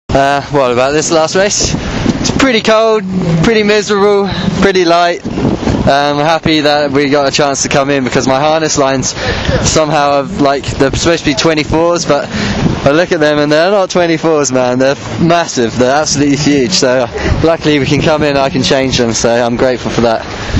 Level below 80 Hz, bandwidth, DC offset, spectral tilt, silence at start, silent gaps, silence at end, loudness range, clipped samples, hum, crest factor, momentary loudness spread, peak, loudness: -30 dBFS; 9.4 kHz; under 0.1%; -4.5 dB/octave; 0.1 s; none; 0 s; 1 LU; 0.2%; none; 10 dB; 4 LU; 0 dBFS; -10 LUFS